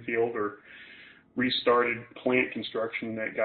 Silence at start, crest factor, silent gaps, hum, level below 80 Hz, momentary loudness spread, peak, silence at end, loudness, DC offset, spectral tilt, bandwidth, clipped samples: 0 s; 18 dB; none; none; -68 dBFS; 22 LU; -10 dBFS; 0 s; -28 LUFS; under 0.1%; -8.5 dB/octave; 4.6 kHz; under 0.1%